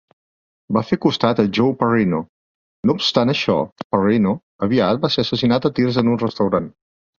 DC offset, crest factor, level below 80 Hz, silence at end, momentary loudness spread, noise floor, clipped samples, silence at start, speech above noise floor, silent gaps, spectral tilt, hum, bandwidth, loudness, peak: under 0.1%; 18 dB; -52 dBFS; 0.5 s; 6 LU; under -90 dBFS; under 0.1%; 0.7 s; over 72 dB; 2.29-2.83 s, 3.72-3.76 s, 3.84-3.90 s, 4.43-4.59 s; -6.5 dB/octave; none; 7.2 kHz; -18 LUFS; -2 dBFS